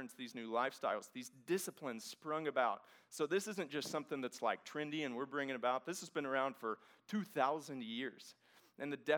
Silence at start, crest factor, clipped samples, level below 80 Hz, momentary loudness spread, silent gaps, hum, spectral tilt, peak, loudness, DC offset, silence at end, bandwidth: 0 s; 22 dB; under 0.1%; under -90 dBFS; 11 LU; none; none; -4 dB/octave; -20 dBFS; -41 LUFS; under 0.1%; 0 s; over 20 kHz